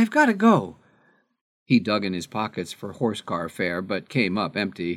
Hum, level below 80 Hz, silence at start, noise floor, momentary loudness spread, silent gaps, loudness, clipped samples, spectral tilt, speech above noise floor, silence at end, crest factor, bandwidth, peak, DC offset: none; -66 dBFS; 0 s; -62 dBFS; 11 LU; 1.41-1.66 s; -24 LUFS; under 0.1%; -6 dB/octave; 39 dB; 0 s; 20 dB; 13 kHz; -4 dBFS; under 0.1%